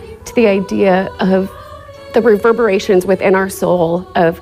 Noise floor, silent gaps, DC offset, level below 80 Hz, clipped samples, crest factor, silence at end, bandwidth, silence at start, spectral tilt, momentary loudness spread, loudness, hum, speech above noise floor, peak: -33 dBFS; none; under 0.1%; -44 dBFS; under 0.1%; 12 dB; 0 s; 16 kHz; 0 s; -6 dB/octave; 8 LU; -13 LUFS; none; 21 dB; -2 dBFS